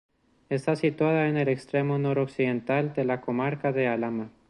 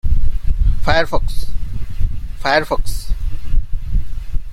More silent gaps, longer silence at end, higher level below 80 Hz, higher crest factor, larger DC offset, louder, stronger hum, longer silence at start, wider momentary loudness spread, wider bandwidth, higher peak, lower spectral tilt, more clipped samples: neither; first, 0.2 s vs 0 s; second, -66 dBFS vs -18 dBFS; about the same, 16 dB vs 12 dB; neither; second, -27 LUFS vs -22 LUFS; neither; first, 0.5 s vs 0.05 s; second, 5 LU vs 12 LU; second, 11 kHz vs 12.5 kHz; second, -12 dBFS vs 0 dBFS; first, -8 dB/octave vs -5.5 dB/octave; neither